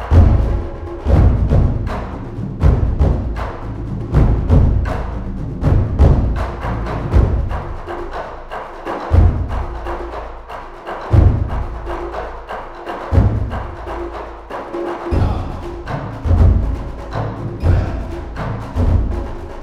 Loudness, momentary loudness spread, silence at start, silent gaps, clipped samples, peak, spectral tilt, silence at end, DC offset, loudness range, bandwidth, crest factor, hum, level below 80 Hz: -19 LUFS; 14 LU; 0 s; none; under 0.1%; 0 dBFS; -9 dB/octave; 0 s; under 0.1%; 5 LU; 6.6 kHz; 16 dB; none; -20 dBFS